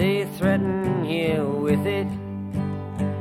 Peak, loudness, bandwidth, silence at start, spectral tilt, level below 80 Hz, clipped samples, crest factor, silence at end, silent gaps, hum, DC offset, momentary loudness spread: -8 dBFS; -24 LUFS; 15 kHz; 0 s; -7.5 dB/octave; -50 dBFS; under 0.1%; 16 dB; 0 s; none; none; under 0.1%; 7 LU